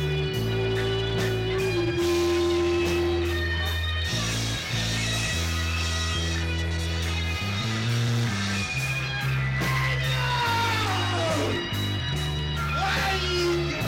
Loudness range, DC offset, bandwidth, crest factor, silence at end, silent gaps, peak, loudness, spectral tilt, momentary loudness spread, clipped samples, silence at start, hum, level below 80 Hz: 2 LU; under 0.1%; 16.5 kHz; 10 dB; 0 s; none; -16 dBFS; -26 LUFS; -4.5 dB/octave; 4 LU; under 0.1%; 0 s; none; -40 dBFS